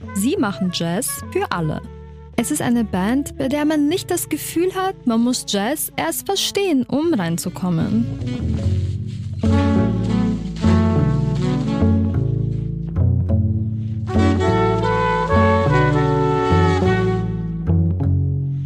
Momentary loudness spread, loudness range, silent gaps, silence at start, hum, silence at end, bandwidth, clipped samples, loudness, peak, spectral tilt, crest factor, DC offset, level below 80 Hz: 7 LU; 4 LU; none; 0 s; none; 0 s; 15.5 kHz; under 0.1%; -19 LUFS; -6 dBFS; -6 dB/octave; 14 dB; under 0.1%; -34 dBFS